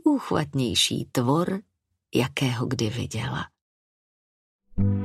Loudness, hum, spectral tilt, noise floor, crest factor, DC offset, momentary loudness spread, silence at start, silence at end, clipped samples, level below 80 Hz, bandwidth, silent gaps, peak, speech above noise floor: -26 LUFS; none; -5 dB/octave; under -90 dBFS; 20 dB; under 0.1%; 11 LU; 0.05 s; 0 s; under 0.1%; -46 dBFS; 15.5 kHz; 3.61-4.59 s; -8 dBFS; over 65 dB